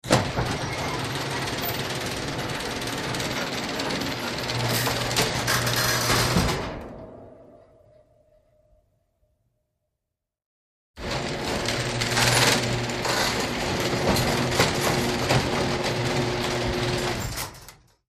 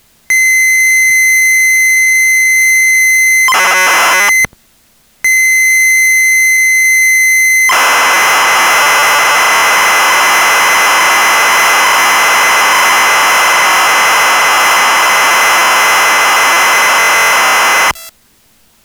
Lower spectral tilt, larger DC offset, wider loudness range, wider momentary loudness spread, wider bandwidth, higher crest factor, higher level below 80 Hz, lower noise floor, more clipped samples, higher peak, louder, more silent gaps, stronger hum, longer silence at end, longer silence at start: first, -3.5 dB/octave vs 1.5 dB/octave; neither; first, 8 LU vs 1 LU; first, 8 LU vs 1 LU; second, 15.5 kHz vs over 20 kHz; first, 24 dB vs 8 dB; first, -42 dBFS vs -52 dBFS; first, -85 dBFS vs -49 dBFS; neither; second, -4 dBFS vs 0 dBFS; second, -24 LUFS vs -6 LUFS; first, 10.46-10.94 s vs none; neither; second, 0.35 s vs 0.75 s; second, 0.05 s vs 0.3 s